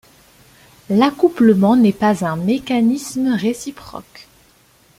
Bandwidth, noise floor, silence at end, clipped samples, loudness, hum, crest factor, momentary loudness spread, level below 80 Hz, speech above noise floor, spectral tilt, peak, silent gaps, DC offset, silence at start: 15.5 kHz; -53 dBFS; 0.75 s; under 0.1%; -16 LUFS; none; 16 dB; 17 LU; -54 dBFS; 37 dB; -6.5 dB/octave; -2 dBFS; none; under 0.1%; 0.9 s